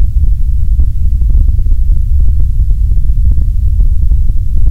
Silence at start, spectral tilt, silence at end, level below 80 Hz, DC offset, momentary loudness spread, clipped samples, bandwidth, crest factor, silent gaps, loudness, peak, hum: 0 s; -9.5 dB/octave; 0 s; -8 dBFS; under 0.1%; 2 LU; 2%; 0.8 kHz; 6 dB; none; -14 LUFS; 0 dBFS; none